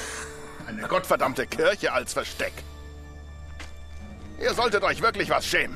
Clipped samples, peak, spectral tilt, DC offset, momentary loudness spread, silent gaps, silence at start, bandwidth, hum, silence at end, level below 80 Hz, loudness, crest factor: under 0.1%; -8 dBFS; -3.5 dB/octave; under 0.1%; 20 LU; none; 0 s; 14 kHz; none; 0 s; -46 dBFS; -25 LUFS; 18 dB